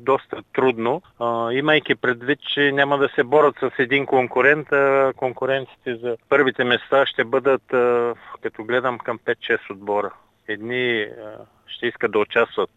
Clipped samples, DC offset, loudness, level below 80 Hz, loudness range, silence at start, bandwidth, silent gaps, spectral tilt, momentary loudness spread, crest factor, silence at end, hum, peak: under 0.1%; under 0.1%; -20 LUFS; -66 dBFS; 6 LU; 0 s; 7.8 kHz; none; -6.5 dB/octave; 11 LU; 18 dB; 0.1 s; none; -2 dBFS